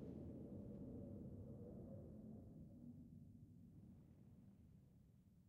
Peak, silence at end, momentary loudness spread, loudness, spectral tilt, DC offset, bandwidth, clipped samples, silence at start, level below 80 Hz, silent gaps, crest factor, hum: -44 dBFS; 0 s; 12 LU; -59 LUFS; -12.5 dB/octave; under 0.1%; 3.9 kHz; under 0.1%; 0 s; -72 dBFS; none; 14 dB; none